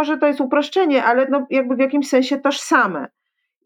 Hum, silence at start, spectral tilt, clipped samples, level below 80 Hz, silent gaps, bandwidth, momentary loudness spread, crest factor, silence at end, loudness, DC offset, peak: none; 0 s; -3.5 dB/octave; under 0.1%; -74 dBFS; none; 13.5 kHz; 4 LU; 16 dB; 0.6 s; -17 LUFS; under 0.1%; -2 dBFS